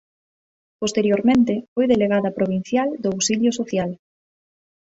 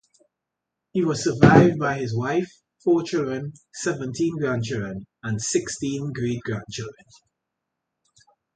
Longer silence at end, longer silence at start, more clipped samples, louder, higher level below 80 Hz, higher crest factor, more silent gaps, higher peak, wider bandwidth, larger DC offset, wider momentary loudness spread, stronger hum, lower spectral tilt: second, 0.9 s vs 1.65 s; second, 0.8 s vs 0.95 s; neither; first, -20 LUFS vs -23 LUFS; about the same, -56 dBFS vs -54 dBFS; second, 16 dB vs 24 dB; first, 1.68-1.76 s vs none; second, -6 dBFS vs 0 dBFS; second, 8 kHz vs 9.4 kHz; neither; second, 8 LU vs 17 LU; neither; about the same, -5 dB/octave vs -6 dB/octave